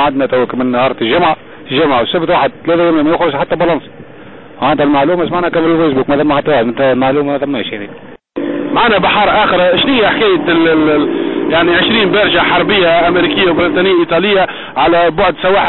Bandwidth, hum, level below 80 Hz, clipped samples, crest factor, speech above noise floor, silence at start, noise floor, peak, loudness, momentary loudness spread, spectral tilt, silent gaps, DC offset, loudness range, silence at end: 4.2 kHz; none; -40 dBFS; under 0.1%; 10 dB; 23 dB; 0 s; -34 dBFS; -2 dBFS; -11 LUFS; 6 LU; -10.5 dB/octave; none; under 0.1%; 3 LU; 0 s